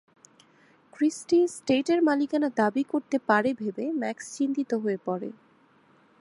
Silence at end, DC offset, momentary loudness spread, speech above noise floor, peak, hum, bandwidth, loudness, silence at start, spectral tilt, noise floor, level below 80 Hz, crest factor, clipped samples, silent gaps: 0.9 s; under 0.1%; 8 LU; 35 dB; -8 dBFS; none; 11.5 kHz; -26 LUFS; 1 s; -5 dB/octave; -61 dBFS; -72 dBFS; 20 dB; under 0.1%; none